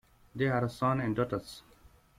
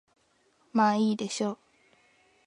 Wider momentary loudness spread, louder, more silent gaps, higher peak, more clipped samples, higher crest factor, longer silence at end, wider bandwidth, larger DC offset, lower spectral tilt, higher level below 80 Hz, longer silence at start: first, 18 LU vs 9 LU; second, -32 LUFS vs -28 LUFS; neither; second, -16 dBFS vs -10 dBFS; neither; about the same, 16 dB vs 20 dB; second, 0.6 s vs 0.9 s; first, 15 kHz vs 11 kHz; neither; first, -7.5 dB/octave vs -5 dB/octave; first, -60 dBFS vs -78 dBFS; second, 0.35 s vs 0.75 s